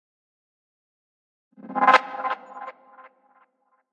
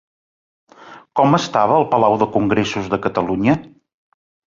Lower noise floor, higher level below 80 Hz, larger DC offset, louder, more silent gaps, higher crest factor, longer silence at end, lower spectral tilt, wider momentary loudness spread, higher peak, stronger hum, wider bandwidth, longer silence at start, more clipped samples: first, -67 dBFS vs -38 dBFS; second, under -90 dBFS vs -50 dBFS; neither; second, -22 LUFS vs -17 LUFS; neither; first, 26 dB vs 18 dB; first, 1.2 s vs 0.8 s; second, -3 dB/octave vs -6.5 dB/octave; first, 22 LU vs 6 LU; about the same, -2 dBFS vs -2 dBFS; neither; first, 9 kHz vs 7.6 kHz; first, 1.65 s vs 0.85 s; neither